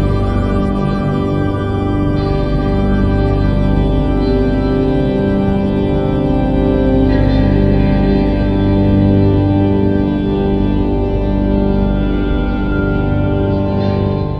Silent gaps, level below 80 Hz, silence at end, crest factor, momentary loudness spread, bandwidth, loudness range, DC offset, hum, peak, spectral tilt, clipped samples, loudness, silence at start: none; -20 dBFS; 0 s; 12 dB; 4 LU; 5.8 kHz; 3 LU; under 0.1%; none; 0 dBFS; -10 dB/octave; under 0.1%; -14 LUFS; 0 s